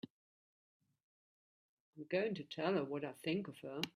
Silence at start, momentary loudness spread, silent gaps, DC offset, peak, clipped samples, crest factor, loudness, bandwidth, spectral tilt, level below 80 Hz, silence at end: 1.95 s; 10 LU; none; under 0.1%; -20 dBFS; under 0.1%; 24 dB; -41 LUFS; 14.5 kHz; -6 dB/octave; -82 dBFS; 0.05 s